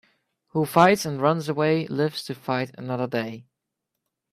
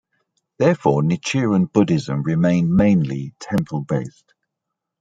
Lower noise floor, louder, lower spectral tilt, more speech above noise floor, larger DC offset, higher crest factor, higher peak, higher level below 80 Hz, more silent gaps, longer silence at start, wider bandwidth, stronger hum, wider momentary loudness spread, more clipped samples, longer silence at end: about the same, -82 dBFS vs -81 dBFS; second, -24 LUFS vs -19 LUFS; about the same, -6 dB/octave vs -7 dB/octave; second, 59 dB vs 63 dB; neither; about the same, 22 dB vs 18 dB; about the same, -4 dBFS vs -2 dBFS; second, -66 dBFS vs -50 dBFS; neither; about the same, 0.55 s vs 0.6 s; first, 15.5 kHz vs 9.2 kHz; neither; first, 13 LU vs 9 LU; neither; about the same, 0.9 s vs 0.9 s